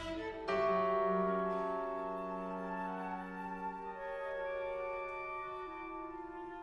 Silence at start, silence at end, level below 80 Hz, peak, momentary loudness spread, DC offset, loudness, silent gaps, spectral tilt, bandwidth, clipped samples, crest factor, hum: 0 s; 0 s; -62 dBFS; -22 dBFS; 12 LU; under 0.1%; -39 LUFS; none; -7 dB/octave; 11.5 kHz; under 0.1%; 16 dB; none